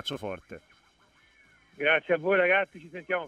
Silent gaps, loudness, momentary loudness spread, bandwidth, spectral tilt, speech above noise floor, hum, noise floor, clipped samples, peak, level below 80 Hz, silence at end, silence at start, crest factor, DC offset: none; -26 LUFS; 22 LU; 12.5 kHz; -5 dB/octave; 35 dB; none; -63 dBFS; under 0.1%; -10 dBFS; -68 dBFS; 0 s; 0.05 s; 18 dB; under 0.1%